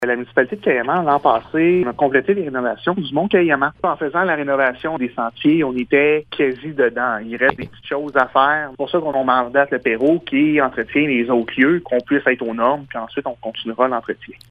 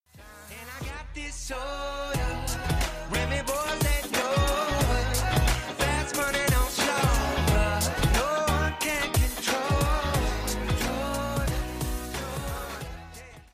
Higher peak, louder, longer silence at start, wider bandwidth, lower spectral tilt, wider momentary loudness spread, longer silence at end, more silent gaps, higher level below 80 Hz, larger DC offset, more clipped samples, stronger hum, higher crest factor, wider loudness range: first, 0 dBFS vs -12 dBFS; first, -18 LUFS vs -27 LUFS; second, 0 s vs 0.15 s; second, 5 kHz vs 15.5 kHz; first, -8 dB/octave vs -4 dB/octave; second, 8 LU vs 12 LU; about the same, 0.2 s vs 0.1 s; neither; second, -54 dBFS vs -32 dBFS; neither; neither; neither; about the same, 18 dB vs 14 dB; second, 2 LU vs 6 LU